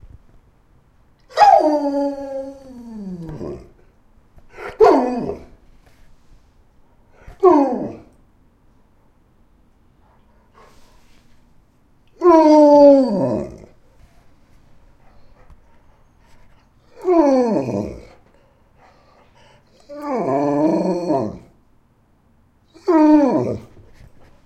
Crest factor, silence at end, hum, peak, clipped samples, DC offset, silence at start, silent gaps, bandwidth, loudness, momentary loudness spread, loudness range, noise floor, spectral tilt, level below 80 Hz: 20 dB; 0.85 s; none; 0 dBFS; under 0.1%; under 0.1%; 1.35 s; none; 8.8 kHz; -15 LUFS; 24 LU; 10 LU; -57 dBFS; -7.5 dB/octave; -50 dBFS